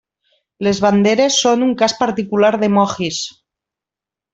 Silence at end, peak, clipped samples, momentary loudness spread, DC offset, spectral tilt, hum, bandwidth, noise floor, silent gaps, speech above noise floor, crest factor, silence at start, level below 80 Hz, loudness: 1.05 s; -2 dBFS; under 0.1%; 8 LU; under 0.1%; -4 dB/octave; none; 8 kHz; -87 dBFS; none; 73 dB; 16 dB; 0.6 s; -54 dBFS; -15 LUFS